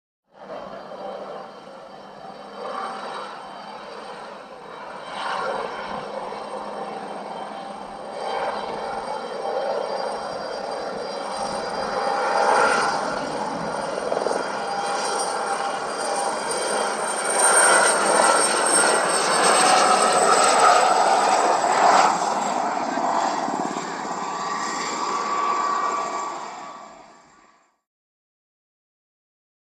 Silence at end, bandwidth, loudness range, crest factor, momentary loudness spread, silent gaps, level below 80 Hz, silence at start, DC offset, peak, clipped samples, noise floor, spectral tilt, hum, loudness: 2.6 s; 14.5 kHz; 17 LU; 20 dB; 20 LU; none; -64 dBFS; 0.4 s; under 0.1%; -4 dBFS; under 0.1%; -57 dBFS; -1 dB/octave; none; -21 LUFS